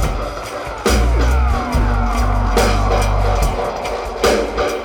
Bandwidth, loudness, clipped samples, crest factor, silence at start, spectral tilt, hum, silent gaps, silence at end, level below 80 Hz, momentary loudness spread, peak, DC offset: 17.5 kHz; -18 LUFS; under 0.1%; 12 dB; 0 s; -5 dB/octave; none; none; 0 s; -18 dBFS; 7 LU; -2 dBFS; under 0.1%